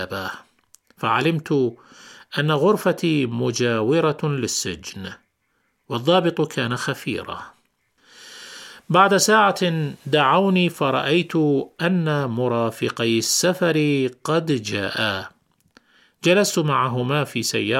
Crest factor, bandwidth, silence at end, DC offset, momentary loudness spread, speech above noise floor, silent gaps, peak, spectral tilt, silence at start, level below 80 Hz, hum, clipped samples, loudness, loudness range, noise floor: 18 dB; 16.5 kHz; 0 s; under 0.1%; 13 LU; 49 dB; none; -2 dBFS; -4.5 dB/octave; 0 s; -62 dBFS; none; under 0.1%; -20 LUFS; 6 LU; -69 dBFS